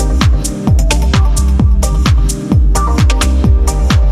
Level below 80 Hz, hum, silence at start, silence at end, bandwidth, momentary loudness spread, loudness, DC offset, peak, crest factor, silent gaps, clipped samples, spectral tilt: -10 dBFS; none; 0 s; 0 s; 13.5 kHz; 2 LU; -12 LUFS; under 0.1%; 0 dBFS; 10 dB; none; under 0.1%; -5.5 dB/octave